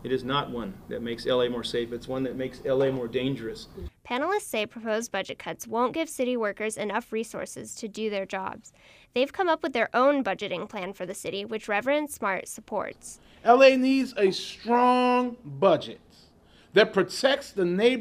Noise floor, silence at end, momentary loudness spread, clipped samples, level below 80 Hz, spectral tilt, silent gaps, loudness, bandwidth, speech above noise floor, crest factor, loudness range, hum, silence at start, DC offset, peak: -57 dBFS; 0 s; 14 LU; under 0.1%; -58 dBFS; -4.5 dB/octave; none; -26 LUFS; 15.5 kHz; 30 dB; 22 dB; 8 LU; none; 0 s; under 0.1%; -6 dBFS